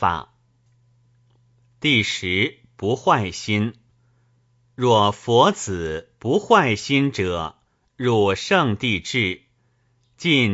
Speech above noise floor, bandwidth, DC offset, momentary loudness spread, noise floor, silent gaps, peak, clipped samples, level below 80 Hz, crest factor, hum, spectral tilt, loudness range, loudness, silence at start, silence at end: 44 dB; 8 kHz; under 0.1%; 11 LU; -64 dBFS; none; 0 dBFS; under 0.1%; -52 dBFS; 20 dB; none; -5 dB/octave; 3 LU; -20 LUFS; 0 s; 0 s